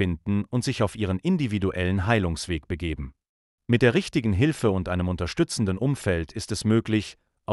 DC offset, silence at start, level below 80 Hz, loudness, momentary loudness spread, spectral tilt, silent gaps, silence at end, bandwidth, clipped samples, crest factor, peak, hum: under 0.1%; 0 s; -44 dBFS; -25 LUFS; 9 LU; -6 dB/octave; 3.29-3.58 s; 0 s; 12 kHz; under 0.1%; 18 dB; -8 dBFS; none